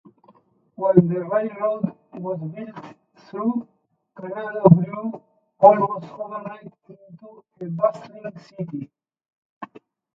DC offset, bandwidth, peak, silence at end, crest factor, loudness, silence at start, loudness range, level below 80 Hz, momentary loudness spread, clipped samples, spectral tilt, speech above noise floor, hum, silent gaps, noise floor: under 0.1%; 5.8 kHz; 0 dBFS; 0.5 s; 22 dB; -21 LUFS; 0.8 s; 11 LU; -64 dBFS; 24 LU; under 0.1%; -11 dB/octave; 36 dB; none; 9.33-9.61 s; -57 dBFS